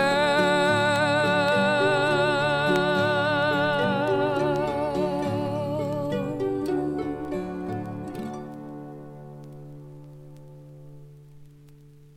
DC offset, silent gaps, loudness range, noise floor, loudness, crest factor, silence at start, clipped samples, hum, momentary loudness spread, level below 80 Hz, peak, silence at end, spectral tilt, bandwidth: under 0.1%; none; 19 LU; -50 dBFS; -24 LUFS; 18 dB; 0 s; under 0.1%; none; 21 LU; -54 dBFS; -8 dBFS; 0.7 s; -5.5 dB/octave; 15 kHz